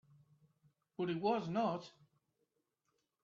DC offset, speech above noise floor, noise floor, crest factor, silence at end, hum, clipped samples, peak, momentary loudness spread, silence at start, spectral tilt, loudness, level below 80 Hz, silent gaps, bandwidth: under 0.1%; 48 dB; -85 dBFS; 20 dB; 1.35 s; none; under 0.1%; -22 dBFS; 18 LU; 1 s; -5.5 dB/octave; -38 LUFS; -82 dBFS; none; 7.4 kHz